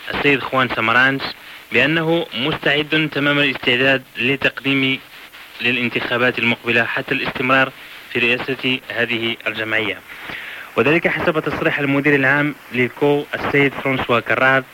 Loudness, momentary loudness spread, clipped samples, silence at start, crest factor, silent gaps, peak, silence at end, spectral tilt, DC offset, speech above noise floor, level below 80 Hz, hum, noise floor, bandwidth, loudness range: -17 LUFS; 9 LU; under 0.1%; 0 s; 16 dB; none; -4 dBFS; 0 s; -5.5 dB/octave; under 0.1%; 21 dB; -52 dBFS; none; -39 dBFS; 17 kHz; 3 LU